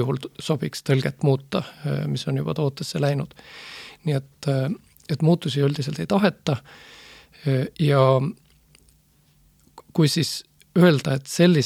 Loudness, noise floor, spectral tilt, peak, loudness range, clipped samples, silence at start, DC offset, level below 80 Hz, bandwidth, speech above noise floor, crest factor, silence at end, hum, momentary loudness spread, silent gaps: -23 LUFS; -59 dBFS; -6.5 dB/octave; -4 dBFS; 4 LU; under 0.1%; 0 s; under 0.1%; -60 dBFS; 15.5 kHz; 37 dB; 20 dB; 0 s; none; 13 LU; none